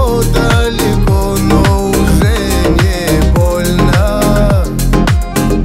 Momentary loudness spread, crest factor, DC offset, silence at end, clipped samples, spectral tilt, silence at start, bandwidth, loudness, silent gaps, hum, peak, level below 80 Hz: 2 LU; 10 dB; under 0.1%; 0 s; under 0.1%; -6 dB/octave; 0 s; 16.5 kHz; -11 LUFS; none; none; 0 dBFS; -14 dBFS